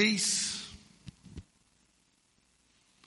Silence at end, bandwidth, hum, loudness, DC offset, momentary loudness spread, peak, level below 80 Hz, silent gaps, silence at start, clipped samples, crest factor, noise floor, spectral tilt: 1.65 s; 11.5 kHz; none; -29 LUFS; under 0.1%; 26 LU; -14 dBFS; -64 dBFS; none; 0 s; under 0.1%; 22 dB; -71 dBFS; -1.5 dB/octave